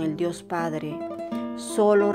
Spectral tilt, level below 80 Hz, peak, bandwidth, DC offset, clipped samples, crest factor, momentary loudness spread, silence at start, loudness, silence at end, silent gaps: -6 dB/octave; -66 dBFS; -8 dBFS; 14 kHz; under 0.1%; under 0.1%; 16 dB; 12 LU; 0 s; -26 LUFS; 0 s; none